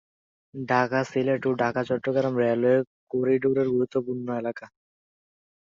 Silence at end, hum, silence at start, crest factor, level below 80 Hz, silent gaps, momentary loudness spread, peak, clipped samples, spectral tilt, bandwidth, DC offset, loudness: 1 s; none; 0.55 s; 18 dB; -66 dBFS; 2.87-3.07 s; 8 LU; -8 dBFS; under 0.1%; -7.5 dB/octave; 7.4 kHz; under 0.1%; -25 LUFS